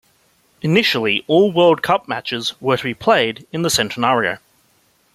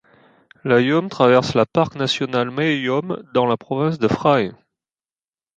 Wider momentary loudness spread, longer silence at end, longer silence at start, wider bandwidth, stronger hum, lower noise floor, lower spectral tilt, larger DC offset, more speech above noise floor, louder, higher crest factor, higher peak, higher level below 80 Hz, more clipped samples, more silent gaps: about the same, 9 LU vs 7 LU; second, 0.75 s vs 1.05 s; about the same, 0.65 s vs 0.65 s; first, 15.5 kHz vs 8.8 kHz; neither; second, -59 dBFS vs under -90 dBFS; second, -4 dB/octave vs -6 dB/octave; neither; second, 42 dB vs over 72 dB; about the same, -17 LUFS vs -19 LUFS; about the same, 16 dB vs 18 dB; about the same, -2 dBFS vs -2 dBFS; about the same, -56 dBFS vs -54 dBFS; neither; neither